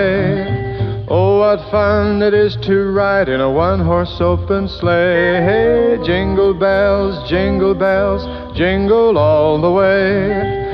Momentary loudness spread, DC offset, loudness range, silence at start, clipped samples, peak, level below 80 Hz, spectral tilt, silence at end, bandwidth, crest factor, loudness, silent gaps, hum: 6 LU; under 0.1%; 1 LU; 0 s; under 0.1%; -2 dBFS; -32 dBFS; -9 dB/octave; 0 s; 5.8 kHz; 12 dB; -14 LUFS; none; none